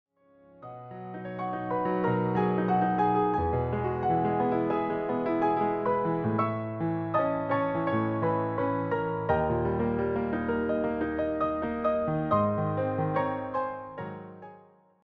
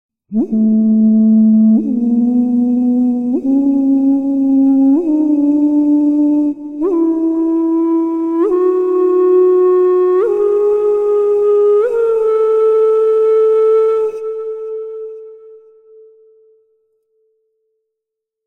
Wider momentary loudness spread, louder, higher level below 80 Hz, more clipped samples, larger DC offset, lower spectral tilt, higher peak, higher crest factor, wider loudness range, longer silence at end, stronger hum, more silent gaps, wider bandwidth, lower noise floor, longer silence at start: about the same, 10 LU vs 9 LU; second, -28 LUFS vs -13 LUFS; about the same, -52 dBFS vs -56 dBFS; neither; neither; about the same, -10.5 dB/octave vs -10.5 dB/octave; second, -12 dBFS vs -4 dBFS; first, 16 dB vs 8 dB; second, 2 LU vs 5 LU; second, 0.45 s vs 2.9 s; neither; neither; first, 5.4 kHz vs 3.6 kHz; second, -59 dBFS vs -80 dBFS; first, 0.6 s vs 0.3 s